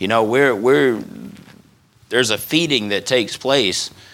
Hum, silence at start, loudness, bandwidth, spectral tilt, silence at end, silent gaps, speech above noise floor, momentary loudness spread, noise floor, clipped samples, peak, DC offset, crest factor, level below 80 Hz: none; 0 s; -17 LUFS; 18 kHz; -3.5 dB/octave; 0.25 s; none; 35 dB; 11 LU; -52 dBFS; under 0.1%; 0 dBFS; under 0.1%; 18 dB; -60 dBFS